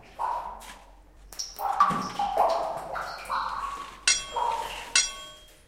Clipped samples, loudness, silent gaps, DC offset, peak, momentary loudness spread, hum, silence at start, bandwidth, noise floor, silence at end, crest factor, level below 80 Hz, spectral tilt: under 0.1%; -27 LUFS; none; under 0.1%; -6 dBFS; 16 LU; none; 0 s; 16 kHz; -51 dBFS; 0.15 s; 24 dB; -54 dBFS; -0.5 dB/octave